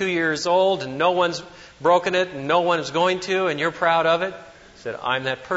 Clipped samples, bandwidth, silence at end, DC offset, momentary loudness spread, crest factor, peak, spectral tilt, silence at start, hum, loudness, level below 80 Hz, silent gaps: under 0.1%; 8 kHz; 0 s; under 0.1%; 10 LU; 16 dB; -6 dBFS; -4 dB/octave; 0 s; none; -21 LUFS; -60 dBFS; none